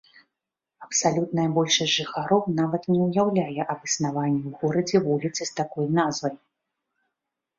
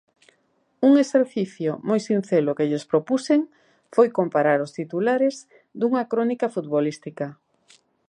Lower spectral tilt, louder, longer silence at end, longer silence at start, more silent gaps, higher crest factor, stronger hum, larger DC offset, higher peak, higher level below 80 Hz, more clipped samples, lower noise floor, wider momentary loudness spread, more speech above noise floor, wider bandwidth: second, -4.5 dB/octave vs -6.5 dB/octave; about the same, -24 LUFS vs -22 LUFS; first, 1.2 s vs 0.75 s; about the same, 0.8 s vs 0.8 s; neither; about the same, 18 dB vs 18 dB; neither; neither; about the same, -8 dBFS vs -6 dBFS; first, -66 dBFS vs -76 dBFS; neither; first, -86 dBFS vs -67 dBFS; second, 7 LU vs 10 LU; first, 62 dB vs 45 dB; second, 7.8 kHz vs 10 kHz